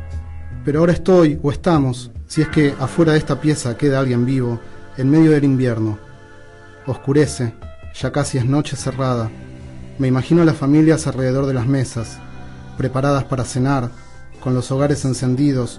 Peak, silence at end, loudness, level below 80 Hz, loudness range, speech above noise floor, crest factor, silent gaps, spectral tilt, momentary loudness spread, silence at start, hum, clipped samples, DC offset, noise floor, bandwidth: -4 dBFS; 0 s; -18 LUFS; -38 dBFS; 4 LU; 23 dB; 14 dB; none; -7 dB/octave; 18 LU; 0 s; none; under 0.1%; under 0.1%; -40 dBFS; 11.5 kHz